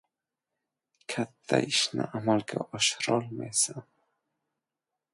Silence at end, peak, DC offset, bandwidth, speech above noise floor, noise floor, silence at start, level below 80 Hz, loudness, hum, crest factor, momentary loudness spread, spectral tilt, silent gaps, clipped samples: 1.3 s; -8 dBFS; under 0.1%; 11.5 kHz; 59 dB; -88 dBFS; 1.1 s; -72 dBFS; -28 LUFS; none; 24 dB; 10 LU; -3 dB/octave; none; under 0.1%